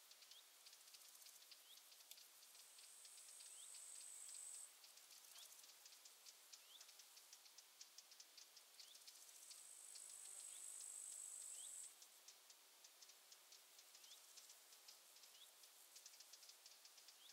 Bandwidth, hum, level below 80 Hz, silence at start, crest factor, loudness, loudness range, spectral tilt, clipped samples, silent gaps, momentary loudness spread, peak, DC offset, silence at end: 16 kHz; none; under -90 dBFS; 0 s; 24 dB; -59 LUFS; 8 LU; 4 dB/octave; under 0.1%; none; 11 LU; -40 dBFS; under 0.1%; 0 s